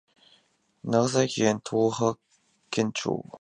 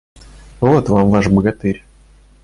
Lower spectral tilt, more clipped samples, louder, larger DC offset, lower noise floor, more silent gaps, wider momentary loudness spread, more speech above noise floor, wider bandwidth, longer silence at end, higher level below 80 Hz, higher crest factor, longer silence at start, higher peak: second, -5 dB/octave vs -8.5 dB/octave; neither; second, -26 LUFS vs -15 LUFS; neither; first, -66 dBFS vs -46 dBFS; neither; about the same, 9 LU vs 9 LU; first, 41 dB vs 33 dB; about the same, 10.5 kHz vs 11 kHz; second, 0.05 s vs 0.65 s; second, -66 dBFS vs -36 dBFS; first, 20 dB vs 14 dB; first, 0.85 s vs 0.6 s; second, -8 dBFS vs -2 dBFS